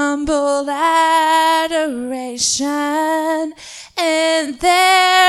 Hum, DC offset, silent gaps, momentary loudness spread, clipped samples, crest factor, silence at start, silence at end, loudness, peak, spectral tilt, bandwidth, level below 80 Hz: none; under 0.1%; none; 11 LU; under 0.1%; 16 dB; 0 s; 0 s; -15 LUFS; 0 dBFS; -1 dB/octave; 14.5 kHz; -48 dBFS